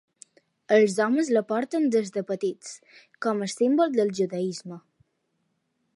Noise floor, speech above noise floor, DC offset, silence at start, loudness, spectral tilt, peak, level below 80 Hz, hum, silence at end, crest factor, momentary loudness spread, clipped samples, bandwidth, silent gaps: -75 dBFS; 50 dB; under 0.1%; 0.7 s; -25 LUFS; -5 dB/octave; -6 dBFS; -80 dBFS; none; 1.15 s; 20 dB; 18 LU; under 0.1%; 11.5 kHz; none